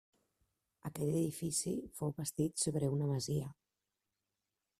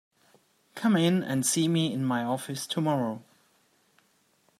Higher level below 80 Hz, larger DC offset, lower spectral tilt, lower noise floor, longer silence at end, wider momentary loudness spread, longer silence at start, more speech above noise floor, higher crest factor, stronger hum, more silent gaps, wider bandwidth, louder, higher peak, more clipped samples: first, -68 dBFS vs -74 dBFS; neither; about the same, -5.5 dB/octave vs -4.5 dB/octave; first, -89 dBFS vs -68 dBFS; about the same, 1.3 s vs 1.4 s; about the same, 7 LU vs 9 LU; about the same, 0.85 s vs 0.75 s; first, 53 dB vs 41 dB; about the same, 18 dB vs 18 dB; neither; neither; about the same, 14.5 kHz vs 15.5 kHz; second, -37 LUFS vs -27 LUFS; second, -22 dBFS vs -12 dBFS; neither